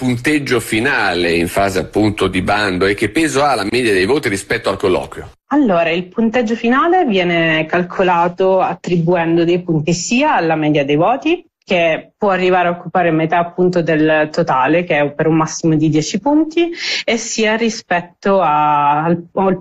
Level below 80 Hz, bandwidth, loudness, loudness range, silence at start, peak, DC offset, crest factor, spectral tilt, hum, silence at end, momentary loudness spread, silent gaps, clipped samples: -46 dBFS; 13 kHz; -15 LUFS; 1 LU; 0 s; -4 dBFS; under 0.1%; 10 dB; -5 dB/octave; none; 0 s; 4 LU; none; under 0.1%